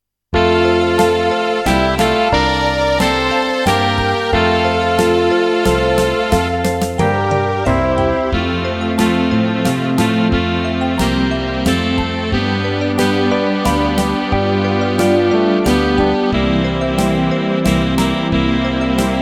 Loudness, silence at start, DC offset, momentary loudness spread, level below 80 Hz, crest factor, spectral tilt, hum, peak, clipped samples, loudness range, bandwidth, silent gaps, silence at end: -15 LUFS; 0.3 s; under 0.1%; 4 LU; -28 dBFS; 14 dB; -5.5 dB/octave; none; 0 dBFS; under 0.1%; 2 LU; 17 kHz; none; 0 s